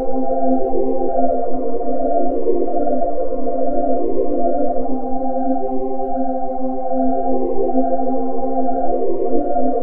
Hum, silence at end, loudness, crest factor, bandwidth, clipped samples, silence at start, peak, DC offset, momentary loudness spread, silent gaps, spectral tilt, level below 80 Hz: none; 0 s; -20 LUFS; 14 dB; 2.2 kHz; under 0.1%; 0 s; -2 dBFS; 20%; 4 LU; none; -13 dB/octave; -34 dBFS